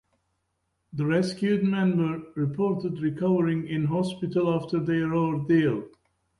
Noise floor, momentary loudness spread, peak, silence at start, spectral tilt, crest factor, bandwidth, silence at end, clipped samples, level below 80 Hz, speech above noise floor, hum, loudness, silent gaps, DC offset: -76 dBFS; 6 LU; -12 dBFS; 0.95 s; -8 dB/octave; 14 dB; 11.5 kHz; 0.5 s; under 0.1%; -62 dBFS; 51 dB; none; -26 LUFS; none; under 0.1%